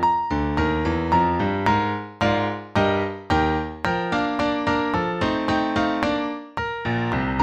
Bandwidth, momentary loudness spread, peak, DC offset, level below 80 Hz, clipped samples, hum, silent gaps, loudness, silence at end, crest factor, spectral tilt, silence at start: 9.4 kHz; 4 LU; -2 dBFS; under 0.1%; -38 dBFS; under 0.1%; none; none; -23 LUFS; 0 s; 20 dB; -6.5 dB/octave; 0 s